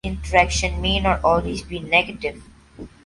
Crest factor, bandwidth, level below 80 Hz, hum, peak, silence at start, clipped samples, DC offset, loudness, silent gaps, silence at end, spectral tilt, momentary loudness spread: 20 dB; 11.5 kHz; -32 dBFS; none; 0 dBFS; 0.05 s; under 0.1%; under 0.1%; -20 LUFS; none; 0.2 s; -4 dB/octave; 12 LU